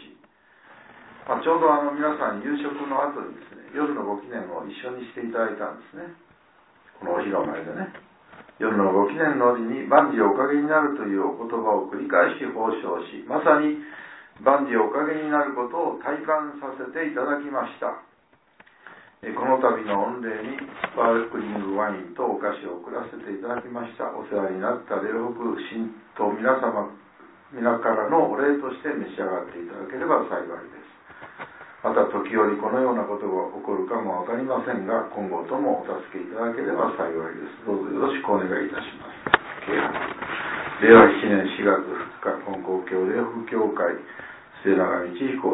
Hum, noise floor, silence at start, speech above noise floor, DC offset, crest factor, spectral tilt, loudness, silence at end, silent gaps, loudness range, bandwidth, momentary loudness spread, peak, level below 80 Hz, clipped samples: none; -61 dBFS; 0 s; 37 dB; under 0.1%; 24 dB; -10 dB/octave; -24 LUFS; 0 s; none; 10 LU; 4 kHz; 14 LU; 0 dBFS; -64 dBFS; under 0.1%